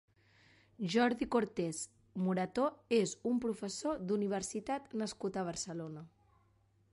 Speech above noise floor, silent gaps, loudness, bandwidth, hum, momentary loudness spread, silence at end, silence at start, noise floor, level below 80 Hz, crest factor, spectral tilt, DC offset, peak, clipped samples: 36 dB; none; -36 LUFS; 11.5 kHz; none; 11 LU; 0.85 s; 0.8 s; -71 dBFS; -68 dBFS; 18 dB; -5 dB/octave; under 0.1%; -20 dBFS; under 0.1%